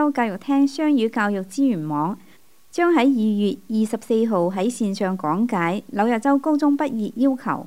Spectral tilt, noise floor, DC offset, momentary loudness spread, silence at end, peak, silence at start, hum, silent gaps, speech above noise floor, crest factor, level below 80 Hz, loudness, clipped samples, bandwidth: -6.5 dB/octave; -54 dBFS; 0.4%; 5 LU; 0 s; -6 dBFS; 0 s; none; none; 34 dB; 16 dB; -70 dBFS; -21 LUFS; under 0.1%; 15 kHz